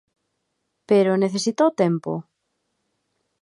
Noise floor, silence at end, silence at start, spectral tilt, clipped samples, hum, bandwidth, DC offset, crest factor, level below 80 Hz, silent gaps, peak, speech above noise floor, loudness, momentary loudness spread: -75 dBFS; 1.2 s; 0.9 s; -6 dB/octave; under 0.1%; none; 11.5 kHz; under 0.1%; 18 dB; -76 dBFS; none; -6 dBFS; 56 dB; -21 LUFS; 11 LU